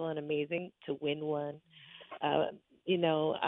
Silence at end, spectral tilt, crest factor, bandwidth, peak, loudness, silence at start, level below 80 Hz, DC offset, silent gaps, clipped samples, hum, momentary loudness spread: 0 s; -9 dB/octave; 20 dB; 4 kHz; -16 dBFS; -35 LUFS; 0 s; -78 dBFS; under 0.1%; none; under 0.1%; none; 19 LU